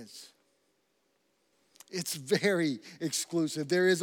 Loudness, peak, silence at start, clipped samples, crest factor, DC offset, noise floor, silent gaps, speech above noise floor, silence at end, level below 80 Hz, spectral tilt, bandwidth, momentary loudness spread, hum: -31 LUFS; -14 dBFS; 0 s; under 0.1%; 20 dB; under 0.1%; -75 dBFS; none; 44 dB; 0 s; under -90 dBFS; -4 dB/octave; 18 kHz; 13 LU; none